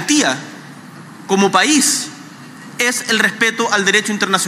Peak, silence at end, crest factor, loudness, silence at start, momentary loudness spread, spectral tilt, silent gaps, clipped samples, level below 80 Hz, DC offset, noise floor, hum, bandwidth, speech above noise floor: 0 dBFS; 0 s; 16 dB; -14 LUFS; 0 s; 23 LU; -2 dB/octave; none; under 0.1%; -70 dBFS; under 0.1%; -36 dBFS; none; 16 kHz; 21 dB